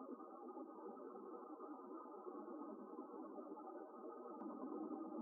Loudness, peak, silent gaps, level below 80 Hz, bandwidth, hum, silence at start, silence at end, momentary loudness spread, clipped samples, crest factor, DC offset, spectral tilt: -54 LUFS; -38 dBFS; none; under -90 dBFS; 1.7 kHz; none; 0 s; 0 s; 5 LU; under 0.1%; 16 dB; under 0.1%; 3 dB/octave